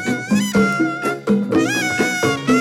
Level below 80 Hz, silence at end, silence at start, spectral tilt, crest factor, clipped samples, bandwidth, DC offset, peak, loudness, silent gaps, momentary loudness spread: -52 dBFS; 0 s; 0 s; -4.5 dB/octave; 12 dB; under 0.1%; 16.5 kHz; under 0.1%; -4 dBFS; -18 LUFS; none; 3 LU